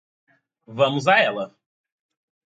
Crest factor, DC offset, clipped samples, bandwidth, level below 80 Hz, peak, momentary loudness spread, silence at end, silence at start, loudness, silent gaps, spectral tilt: 20 dB; under 0.1%; under 0.1%; 9 kHz; -72 dBFS; -4 dBFS; 18 LU; 1 s; 0.7 s; -20 LUFS; none; -5 dB/octave